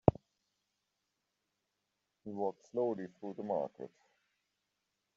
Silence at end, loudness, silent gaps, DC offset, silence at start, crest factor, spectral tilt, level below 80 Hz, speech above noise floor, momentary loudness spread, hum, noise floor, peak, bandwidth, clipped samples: 1.3 s; -39 LUFS; none; under 0.1%; 0.05 s; 34 dB; -9.5 dB/octave; -62 dBFS; 47 dB; 15 LU; 50 Hz at -65 dBFS; -86 dBFS; -6 dBFS; 7.6 kHz; under 0.1%